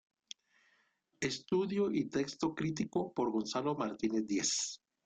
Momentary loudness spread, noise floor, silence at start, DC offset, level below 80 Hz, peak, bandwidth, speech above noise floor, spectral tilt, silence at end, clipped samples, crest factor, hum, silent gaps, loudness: 8 LU; -75 dBFS; 1.2 s; under 0.1%; -70 dBFS; -22 dBFS; 9.6 kHz; 40 dB; -4 dB/octave; 0.3 s; under 0.1%; 14 dB; none; none; -35 LUFS